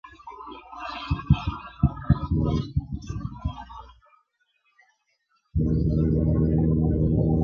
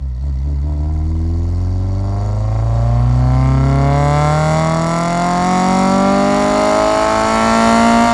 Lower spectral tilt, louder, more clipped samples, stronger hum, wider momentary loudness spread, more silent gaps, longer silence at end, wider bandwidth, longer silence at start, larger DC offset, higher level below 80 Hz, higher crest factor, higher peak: first, -9.5 dB/octave vs -6.5 dB/octave; second, -25 LUFS vs -14 LUFS; neither; neither; first, 19 LU vs 7 LU; neither; about the same, 0 s vs 0 s; second, 6.4 kHz vs 12 kHz; about the same, 0.05 s vs 0 s; neither; second, -32 dBFS vs -22 dBFS; first, 20 dB vs 12 dB; second, -6 dBFS vs 0 dBFS